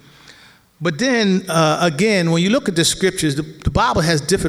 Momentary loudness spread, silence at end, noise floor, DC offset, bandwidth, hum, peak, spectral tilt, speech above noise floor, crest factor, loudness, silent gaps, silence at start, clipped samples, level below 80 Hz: 6 LU; 0 s; -47 dBFS; under 0.1%; 16 kHz; none; -2 dBFS; -4.5 dB/octave; 31 dB; 16 dB; -17 LUFS; none; 0.3 s; under 0.1%; -36 dBFS